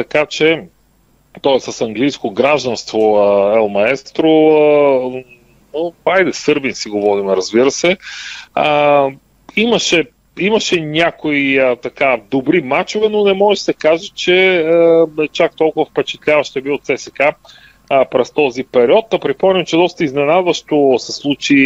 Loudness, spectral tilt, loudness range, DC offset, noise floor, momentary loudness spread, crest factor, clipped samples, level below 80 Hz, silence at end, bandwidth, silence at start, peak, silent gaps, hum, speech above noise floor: -14 LUFS; -4.5 dB/octave; 3 LU; under 0.1%; -54 dBFS; 8 LU; 14 dB; under 0.1%; -54 dBFS; 0 s; 8.2 kHz; 0 s; 0 dBFS; none; none; 40 dB